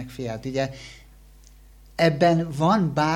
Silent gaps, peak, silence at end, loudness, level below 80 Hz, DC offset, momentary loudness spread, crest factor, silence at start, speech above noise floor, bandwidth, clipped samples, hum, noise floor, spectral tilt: none; -6 dBFS; 0 s; -23 LUFS; -50 dBFS; under 0.1%; 18 LU; 18 dB; 0 s; 27 dB; 16 kHz; under 0.1%; none; -49 dBFS; -6.5 dB/octave